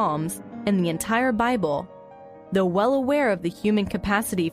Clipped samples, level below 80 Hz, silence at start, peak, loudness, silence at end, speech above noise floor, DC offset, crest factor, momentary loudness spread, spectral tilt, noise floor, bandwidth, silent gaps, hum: under 0.1%; -50 dBFS; 0 s; -8 dBFS; -24 LUFS; 0 s; 22 dB; under 0.1%; 16 dB; 8 LU; -5.5 dB/octave; -44 dBFS; 15.5 kHz; none; none